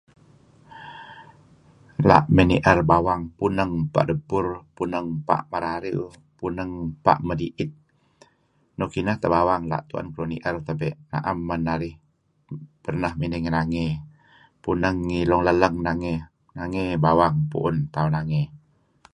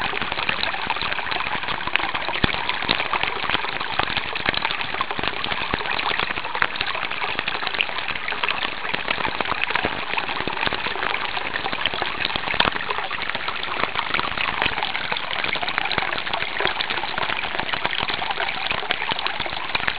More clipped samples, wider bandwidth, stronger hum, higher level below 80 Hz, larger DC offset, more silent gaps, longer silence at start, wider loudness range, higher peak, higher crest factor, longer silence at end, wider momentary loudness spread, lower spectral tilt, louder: neither; first, 9.8 kHz vs 4 kHz; neither; about the same, -42 dBFS vs -46 dBFS; second, under 0.1% vs 2%; neither; first, 0.7 s vs 0 s; first, 7 LU vs 1 LU; about the same, 0 dBFS vs 0 dBFS; about the same, 24 dB vs 24 dB; first, 0.55 s vs 0 s; first, 16 LU vs 3 LU; first, -8 dB/octave vs 0 dB/octave; about the same, -23 LUFS vs -23 LUFS